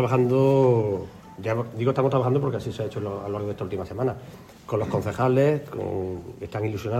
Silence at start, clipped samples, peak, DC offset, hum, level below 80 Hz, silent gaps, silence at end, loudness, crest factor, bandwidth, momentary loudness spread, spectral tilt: 0 s; under 0.1%; -8 dBFS; under 0.1%; none; -54 dBFS; none; 0 s; -25 LUFS; 16 dB; 14 kHz; 14 LU; -8.5 dB/octave